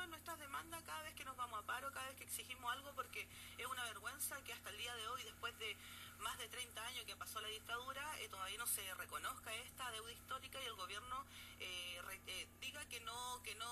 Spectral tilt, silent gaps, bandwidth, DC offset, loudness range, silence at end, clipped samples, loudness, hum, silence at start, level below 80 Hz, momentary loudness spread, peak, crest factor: -1 dB/octave; none; 15.5 kHz; under 0.1%; 2 LU; 0 s; under 0.1%; -48 LUFS; none; 0 s; -72 dBFS; 5 LU; -30 dBFS; 20 dB